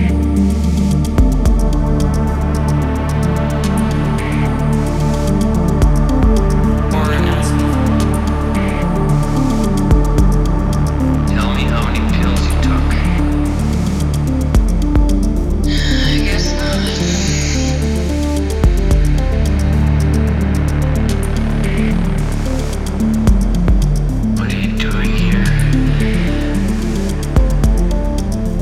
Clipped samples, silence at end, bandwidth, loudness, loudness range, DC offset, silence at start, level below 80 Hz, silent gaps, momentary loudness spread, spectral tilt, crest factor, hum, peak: under 0.1%; 0 s; 15 kHz; -15 LUFS; 2 LU; under 0.1%; 0 s; -16 dBFS; none; 3 LU; -6.5 dB/octave; 12 dB; none; 0 dBFS